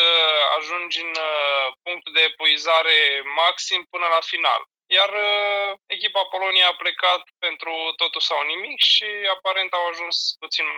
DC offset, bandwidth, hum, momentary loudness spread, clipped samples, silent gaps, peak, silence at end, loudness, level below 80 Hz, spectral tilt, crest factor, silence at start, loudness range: under 0.1%; 19.5 kHz; none; 9 LU; under 0.1%; none; -6 dBFS; 0 s; -19 LUFS; -80 dBFS; 1.5 dB/octave; 16 dB; 0 s; 2 LU